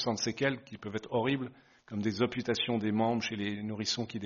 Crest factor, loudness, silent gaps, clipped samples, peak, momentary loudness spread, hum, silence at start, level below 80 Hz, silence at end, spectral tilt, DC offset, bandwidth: 20 dB; -33 LUFS; none; under 0.1%; -14 dBFS; 10 LU; none; 0 s; -68 dBFS; 0 s; -4 dB/octave; under 0.1%; 7.2 kHz